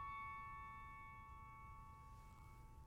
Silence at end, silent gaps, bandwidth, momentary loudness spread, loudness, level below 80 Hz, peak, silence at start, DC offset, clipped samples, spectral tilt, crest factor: 0 s; none; 16.5 kHz; 11 LU; -56 LUFS; -64 dBFS; -42 dBFS; 0 s; under 0.1%; under 0.1%; -5.5 dB/octave; 14 dB